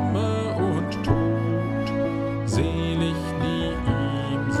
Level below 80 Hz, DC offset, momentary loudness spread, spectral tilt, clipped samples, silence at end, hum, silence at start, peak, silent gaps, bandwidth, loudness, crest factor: -38 dBFS; under 0.1%; 3 LU; -7 dB/octave; under 0.1%; 0 s; none; 0 s; -8 dBFS; none; 12 kHz; -25 LUFS; 16 dB